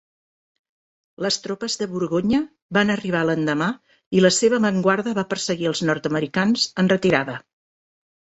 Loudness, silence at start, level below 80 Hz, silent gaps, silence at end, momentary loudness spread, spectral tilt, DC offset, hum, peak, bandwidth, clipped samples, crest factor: -21 LUFS; 1.2 s; -58 dBFS; 2.62-2.69 s, 4.06-4.11 s; 0.95 s; 8 LU; -4.5 dB/octave; under 0.1%; none; -2 dBFS; 8.2 kHz; under 0.1%; 20 dB